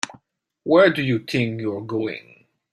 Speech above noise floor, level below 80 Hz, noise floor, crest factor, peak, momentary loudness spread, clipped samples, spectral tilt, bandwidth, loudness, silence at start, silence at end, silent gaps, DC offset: 44 dB; -62 dBFS; -64 dBFS; 18 dB; -4 dBFS; 17 LU; under 0.1%; -5.5 dB/octave; 12.5 kHz; -21 LUFS; 0.05 s; 0.55 s; none; under 0.1%